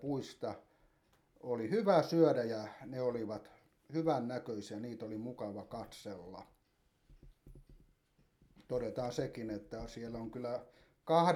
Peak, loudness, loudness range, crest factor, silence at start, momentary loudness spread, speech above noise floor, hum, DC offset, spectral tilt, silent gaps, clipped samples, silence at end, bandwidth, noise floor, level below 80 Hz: -16 dBFS; -38 LUFS; 14 LU; 22 dB; 0 s; 17 LU; 39 dB; none; under 0.1%; -7 dB/octave; none; under 0.1%; 0 s; 15 kHz; -75 dBFS; -66 dBFS